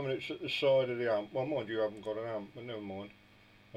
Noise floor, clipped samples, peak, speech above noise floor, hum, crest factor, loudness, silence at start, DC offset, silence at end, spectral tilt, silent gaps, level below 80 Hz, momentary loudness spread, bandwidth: -61 dBFS; under 0.1%; -18 dBFS; 27 dB; none; 16 dB; -35 LUFS; 0 s; under 0.1%; 0 s; -6 dB/octave; none; -74 dBFS; 15 LU; 9.6 kHz